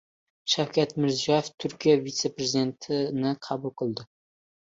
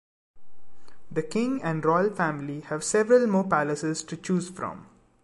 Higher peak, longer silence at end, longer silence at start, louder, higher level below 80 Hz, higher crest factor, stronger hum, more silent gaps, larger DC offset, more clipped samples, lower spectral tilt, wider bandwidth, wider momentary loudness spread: about the same, -10 dBFS vs -8 dBFS; first, 0.65 s vs 0 s; about the same, 0.45 s vs 0.35 s; about the same, -27 LUFS vs -26 LUFS; about the same, -68 dBFS vs -64 dBFS; about the same, 18 dB vs 18 dB; neither; first, 1.54-1.58 s vs none; neither; neither; about the same, -4.5 dB/octave vs -5.5 dB/octave; second, 7.8 kHz vs 11.5 kHz; second, 9 LU vs 14 LU